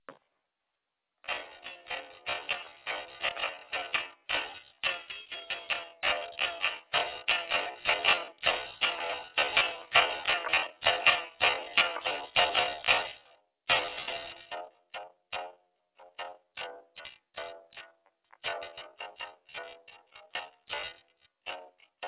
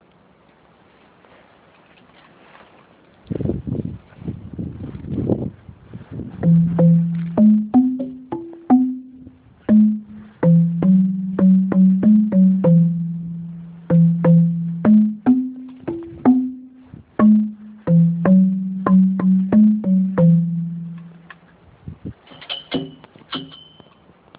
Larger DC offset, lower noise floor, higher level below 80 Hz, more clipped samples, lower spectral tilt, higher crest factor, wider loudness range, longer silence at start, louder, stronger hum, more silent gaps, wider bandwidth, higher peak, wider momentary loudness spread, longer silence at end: neither; first, -86 dBFS vs -53 dBFS; second, -66 dBFS vs -48 dBFS; neither; second, 2.5 dB/octave vs -12.5 dB/octave; first, 26 dB vs 16 dB; about the same, 16 LU vs 15 LU; second, 0.1 s vs 3.3 s; second, -30 LUFS vs -17 LUFS; neither; neither; about the same, 4 kHz vs 4 kHz; second, -8 dBFS vs -2 dBFS; about the same, 19 LU vs 19 LU; second, 0 s vs 0.8 s